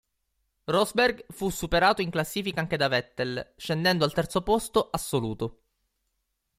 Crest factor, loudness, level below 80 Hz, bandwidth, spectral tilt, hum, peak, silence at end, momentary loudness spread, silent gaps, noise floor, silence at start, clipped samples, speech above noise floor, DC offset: 20 dB; -27 LUFS; -50 dBFS; 16 kHz; -4.5 dB/octave; none; -8 dBFS; 1.05 s; 10 LU; none; -78 dBFS; 0.7 s; under 0.1%; 52 dB; under 0.1%